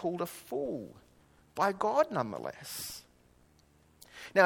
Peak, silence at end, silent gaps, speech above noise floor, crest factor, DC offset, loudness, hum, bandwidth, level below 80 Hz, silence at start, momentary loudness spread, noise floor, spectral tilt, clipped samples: -8 dBFS; 0 s; none; 31 dB; 26 dB; under 0.1%; -34 LUFS; none; 18 kHz; -70 dBFS; 0 s; 19 LU; -65 dBFS; -4.5 dB/octave; under 0.1%